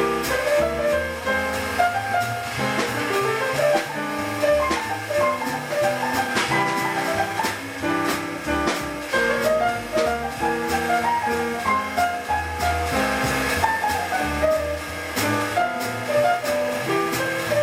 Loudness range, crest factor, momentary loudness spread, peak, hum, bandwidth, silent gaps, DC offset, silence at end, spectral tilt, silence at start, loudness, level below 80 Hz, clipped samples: 1 LU; 18 dB; 5 LU; -6 dBFS; none; 17 kHz; none; under 0.1%; 0 s; -4 dB/octave; 0 s; -22 LUFS; -42 dBFS; under 0.1%